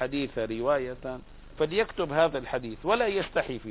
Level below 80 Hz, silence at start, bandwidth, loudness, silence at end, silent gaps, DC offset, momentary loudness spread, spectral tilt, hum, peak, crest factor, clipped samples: -50 dBFS; 0 s; 4 kHz; -29 LUFS; 0 s; none; under 0.1%; 10 LU; -9.5 dB/octave; none; -10 dBFS; 18 dB; under 0.1%